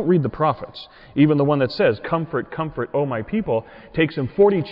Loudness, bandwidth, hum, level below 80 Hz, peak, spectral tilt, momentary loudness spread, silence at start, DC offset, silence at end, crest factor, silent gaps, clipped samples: -21 LUFS; 5.6 kHz; none; -50 dBFS; -6 dBFS; -10 dB/octave; 11 LU; 0 s; under 0.1%; 0 s; 14 dB; none; under 0.1%